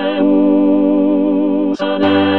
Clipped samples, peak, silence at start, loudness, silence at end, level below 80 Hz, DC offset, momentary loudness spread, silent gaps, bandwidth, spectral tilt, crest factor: under 0.1%; -2 dBFS; 0 s; -13 LUFS; 0 s; -60 dBFS; 1%; 4 LU; none; 5.6 kHz; -8 dB/octave; 12 dB